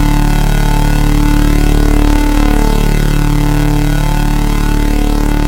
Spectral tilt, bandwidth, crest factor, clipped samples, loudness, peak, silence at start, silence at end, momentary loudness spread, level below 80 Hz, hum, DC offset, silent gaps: -6 dB/octave; 17 kHz; 8 dB; under 0.1%; -13 LUFS; 0 dBFS; 0 s; 0 s; 2 LU; -10 dBFS; none; under 0.1%; none